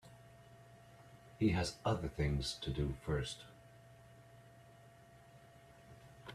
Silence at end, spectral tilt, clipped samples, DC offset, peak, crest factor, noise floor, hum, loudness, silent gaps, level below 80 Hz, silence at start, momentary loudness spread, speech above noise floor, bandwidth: 0 s; -5.5 dB/octave; under 0.1%; under 0.1%; -22 dBFS; 20 dB; -61 dBFS; none; -39 LUFS; none; -54 dBFS; 0.05 s; 24 LU; 24 dB; 14 kHz